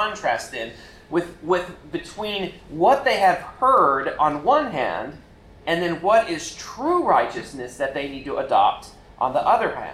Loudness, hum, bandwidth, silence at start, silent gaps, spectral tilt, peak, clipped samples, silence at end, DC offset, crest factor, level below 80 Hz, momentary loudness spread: -22 LUFS; none; 13.5 kHz; 0 s; none; -4.5 dB/octave; -6 dBFS; under 0.1%; 0 s; under 0.1%; 16 dB; -52 dBFS; 14 LU